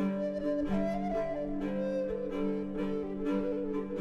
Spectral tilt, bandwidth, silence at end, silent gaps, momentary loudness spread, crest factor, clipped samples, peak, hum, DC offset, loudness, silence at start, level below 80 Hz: -8.5 dB/octave; 7.8 kHz; 0 s; none; 3 LU; 12 dB; under 0.1%; -20 dBFS; none; under 0.1%; -34 LUFS; 0 s; -50 dBFS